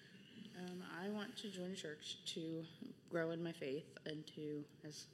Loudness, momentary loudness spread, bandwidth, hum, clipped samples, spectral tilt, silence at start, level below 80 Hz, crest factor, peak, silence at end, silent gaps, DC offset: -48 LUFS; 10 LU; 15.5 kHz; none; under 0.1%; -4.5 dB/octave; 0 s; under -90 dBFS; 20 dB; -28 dBFS; 0 s; none; under 0.1%